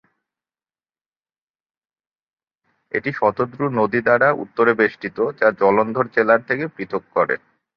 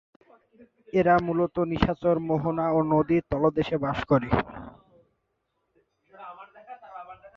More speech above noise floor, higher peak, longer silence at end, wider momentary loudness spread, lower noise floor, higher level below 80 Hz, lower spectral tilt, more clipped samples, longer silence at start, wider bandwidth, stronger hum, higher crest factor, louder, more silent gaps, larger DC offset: first, over 71 dB vs 53 dB; first, -2 dBFS vs -6 dBFS; first, 0.4 s vs 0.1 s; second, 8 LU vs 22 LU; first, under -90 dBFS vs -77 dBFS; second, -62 dBFS vs -48 dBFS; about the same, -9 dB/octave vs -9 dB/octave; neither; first, 2.95 s vs 0.95 s; second, 6 kHz vs 7 kHz; neither; about the same, 20 dB vs 22 dB; first, -19 LUFS vs -25 LUFS; neither; neither